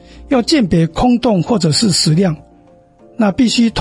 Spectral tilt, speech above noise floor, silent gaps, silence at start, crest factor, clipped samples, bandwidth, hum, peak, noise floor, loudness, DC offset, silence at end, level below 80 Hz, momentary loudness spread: -5 dB/octave; 33 dB; none; 0.15 s; 12 dB; under 0.1%; 11.5 kHz; none; -2 dBFS; -46 dBFS; -13 LUFS; under 0.1%; 0 s; -38 dBFS; 6 LU